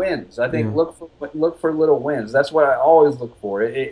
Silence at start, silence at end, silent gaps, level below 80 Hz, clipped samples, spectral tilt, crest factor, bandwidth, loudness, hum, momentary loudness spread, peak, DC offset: 0 s; 0 s; none; -54 dBFS; under 0.1%; -7.5 dB/octave; 16 dB; 10.5 kHz; -18 LUFS; none; 12 LU; -2 dBFS; under 0.1%